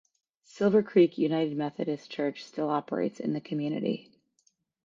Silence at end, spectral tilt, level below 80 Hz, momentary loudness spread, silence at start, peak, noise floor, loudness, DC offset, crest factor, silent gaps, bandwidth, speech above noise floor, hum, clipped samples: 0.85 s; -7.5 dB/octave; -76 dBFS; 10 LU; 0.55 s; -10 dBFS; -72 dBFS; -29 LUFS; under 0.1%; 18 dB; none; 7.6 kHz; 44 dB; none; under 0.1%